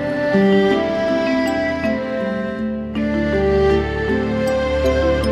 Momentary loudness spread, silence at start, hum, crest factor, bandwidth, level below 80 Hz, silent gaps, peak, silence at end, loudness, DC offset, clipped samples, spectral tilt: 7 LU; 0 s; none; 14 dB; 14.5 kHz; -32 dBFS; none; -4 dBFS; 0 s; -18 LUFS; under 0.1%; under 0.1%; -7 dB/octave